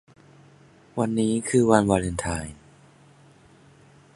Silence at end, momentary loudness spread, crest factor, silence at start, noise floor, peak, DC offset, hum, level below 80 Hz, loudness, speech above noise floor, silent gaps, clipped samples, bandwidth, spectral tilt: 1.6 s; 14 LU; 24 dB; 0.95 s; -54 dBFS; -2 dBFS; under 0.1%; none; -46 dBFS; -23 LUFS; 31 dB; none; under 0.1%; 11.5 kHz; -6 dB/octave